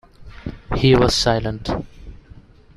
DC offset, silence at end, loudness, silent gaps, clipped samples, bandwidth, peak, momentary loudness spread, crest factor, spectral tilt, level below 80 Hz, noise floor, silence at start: under 0.1%; 0.6 s; -18 LUFS; none; under 0.1%; 13.5 kHz; -2 dBFS; 20 LU; 18 dB; -5 dB/octave; -34 dBFS; -45 dBFS; 0.2 s